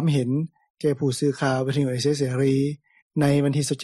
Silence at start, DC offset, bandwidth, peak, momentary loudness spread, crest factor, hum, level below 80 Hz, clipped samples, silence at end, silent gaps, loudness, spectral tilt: 0 s; under 0.1%; 13 kHz; -10 dBFS; 7 LU; 14 dB; none; -60 dBFS; under 0.1%; 0 s; 0.70-0.74 s, 3.02-3.10 s; -23 LUFS; -6.5 dB/octave